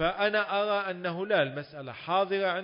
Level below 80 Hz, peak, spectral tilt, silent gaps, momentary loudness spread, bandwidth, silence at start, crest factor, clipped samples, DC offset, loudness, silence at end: -60 dBFS; -12 dBFS; -9 dB/octave; none; 12 LU; 5.4 kHz; 0 s; 16 dB; under 0.1%; under 0.1%; -28 LUFS; 0 s